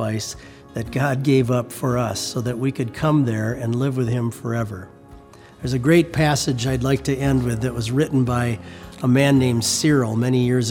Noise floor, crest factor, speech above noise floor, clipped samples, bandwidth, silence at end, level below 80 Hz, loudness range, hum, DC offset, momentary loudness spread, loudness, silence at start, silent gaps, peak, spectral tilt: -44 dBFS; 18 dB; 24 dB; under 0.1%; 17.5 kHz; 0 s; -44 dBFS; 3 LU; none; under 0.1%; 11 LU; -20 LUFS; 0 s; none; -2 dBFS; -5.5 dB/octave